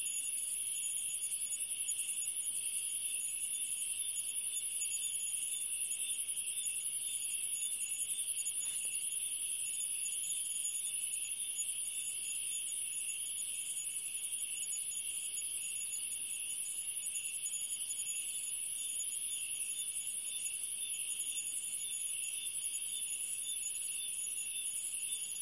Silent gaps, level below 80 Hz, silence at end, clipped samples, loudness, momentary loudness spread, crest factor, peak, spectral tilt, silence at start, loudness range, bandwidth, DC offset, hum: none; -82 dBFS; 0 s; under 0.1%; -35 LUFS; 2 LU; 16 dB; -22 dBFS; 3.5 dB/octave; 0 s; 2 LU; 11.5 kHz; under 0.1%; none